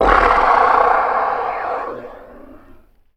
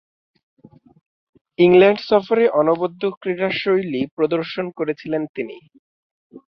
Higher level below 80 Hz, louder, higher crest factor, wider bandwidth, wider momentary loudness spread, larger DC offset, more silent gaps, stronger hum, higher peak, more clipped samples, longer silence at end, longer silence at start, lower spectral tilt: first, -34 dBFS vs -62 dBFS; first, -15 LUFS vs -18 LUFS; about the same, 16 dB vs 18 dB; first, 10.5 kHz vs 6 kHz; first, 17 LU vs 13 LU; neither; second, none vs 3.17-3.21 s, 4.11-4.17 s, 5.29-5.34 s, 5.79-6.30 s; neither; about the same, 0 dBFS vs -2 dBFS; neither; first, 0.6 s vs 0.1 s; second, 0 s vs 1.6 s; second, -5.5 dB/octave vs -8 dB/octave